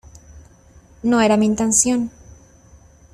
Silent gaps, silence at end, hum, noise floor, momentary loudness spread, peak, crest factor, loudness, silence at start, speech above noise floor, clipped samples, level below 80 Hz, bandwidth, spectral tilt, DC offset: none; 1.05 s; none; -49 dBFS; 10 LU; -2 dBFS; 18 dB; -17 LUFS; 0.3 s; 32 dB; under 0.1%; -48 dBFS; 14 kHz; -3.5 dB/octave; under 0.1%